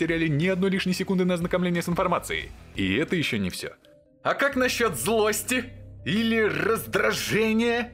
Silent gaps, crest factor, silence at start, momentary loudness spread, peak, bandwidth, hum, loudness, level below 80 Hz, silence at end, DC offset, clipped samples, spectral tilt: none; 16 dB; 0 s; 8 LU; -10 dBFS; 16 kHz; none; -25 LUFS; -50 dBFS; 0 s; under 0.1%; under 0.1%; -4.5 dB/octave